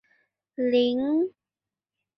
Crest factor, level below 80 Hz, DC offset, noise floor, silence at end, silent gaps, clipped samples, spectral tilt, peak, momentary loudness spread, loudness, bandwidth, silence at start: 16 dB; -72 dBFS; under 0.1%; under -90 dBFS; 0.9 s; none; under 0.1%; -6.5 dB/octave; -12 dBFS; 9 LU; -25 LUFS; 6 kHz; 0.6 s